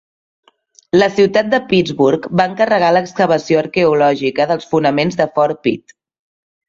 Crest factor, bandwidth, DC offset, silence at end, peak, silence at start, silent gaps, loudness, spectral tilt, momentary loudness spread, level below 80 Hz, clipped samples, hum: 14 dB; 7.6 kHz; under 0.1%; 0.9 s; 0 dBFS; 0.95 s; none; -14 LUFS; -6 dB/octave; 4 LU; -54 dBFS; under 0.1%; none